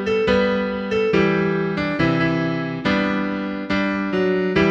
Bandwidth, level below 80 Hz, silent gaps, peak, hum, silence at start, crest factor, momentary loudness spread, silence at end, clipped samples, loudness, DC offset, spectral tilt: 7.8 kHz; -44 dBFS; none; -4 dBFS; none; 0 s; 16 dB; 5 LU; 0 s; under 0.1%; -20 LUFS; under 0.1%; -7 dB/octave